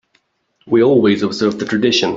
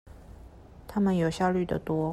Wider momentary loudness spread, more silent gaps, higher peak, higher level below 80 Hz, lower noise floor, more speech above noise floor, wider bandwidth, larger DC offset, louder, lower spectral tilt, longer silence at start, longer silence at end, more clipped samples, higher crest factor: about the same, 6 LU vs 8 LU; neither; first, -2 dBFS vs -12 dBFS; second, -56 dBFS vs -50 dBFS; first, -62 dBFS vs -49 dBFS; first, 48 dB vs 22 dB; second, 7.8 kHz vs 13 kHz; neither; first, -14 LUFS vs -28 LUFS; second, -5 dB/octave vs -7.5 dB/octave; first, 0.65 s vs 0.05 s; about the same, 0 s vs 0 s; neither; about the same, 14 dB vs 16 dB